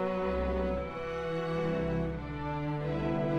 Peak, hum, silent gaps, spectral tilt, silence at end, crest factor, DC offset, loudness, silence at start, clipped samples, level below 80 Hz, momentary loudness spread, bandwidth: -20 dBFS; none; none; -8.5 dB/octave; 0 s; 12 dB; under 0.1%; -34 LUFS; 0 s; under 0.1%; -44 dBFS; 4 LU; 8.8 kHz